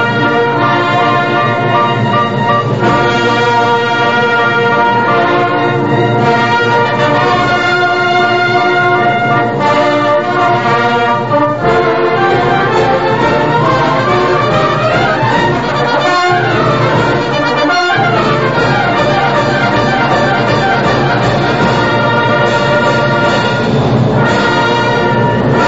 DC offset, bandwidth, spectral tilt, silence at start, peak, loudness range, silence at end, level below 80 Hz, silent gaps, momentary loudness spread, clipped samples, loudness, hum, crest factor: 1%; 8 kHz; -6 dB/octave; 0 s; 0 dBFS; 1 LU; 0 s; -38 dBFS; none; 2 LU; under 0.1%; -10 LUFS; none; 10 dB